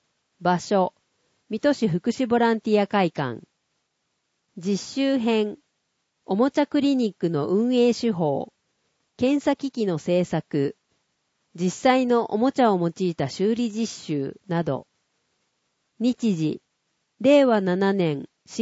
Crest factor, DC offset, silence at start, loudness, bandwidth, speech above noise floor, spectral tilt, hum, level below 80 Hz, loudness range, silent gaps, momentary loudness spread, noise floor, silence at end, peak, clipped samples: 16 dB; under 0.1%; 0.4 s; -23 LUFS; 8 kHz; 53 dB; -6 dB/octave; none; -66 dBFS; 5 LU; none; 9 LU; -75 dBFS; 0 s; -8 dBFS; under 0.1%